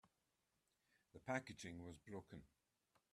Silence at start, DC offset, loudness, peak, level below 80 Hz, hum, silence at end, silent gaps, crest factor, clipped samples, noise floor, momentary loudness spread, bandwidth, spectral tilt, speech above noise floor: 0.05 s; under 0.1%; -52 LUFS; -30 dBFS; -80 dBFS; none; 0.65 s; none; 26 dB; under 0.1%; -88 dBFS; 15 LU; 13.5 kHz; -5 dB/octave; 36 dB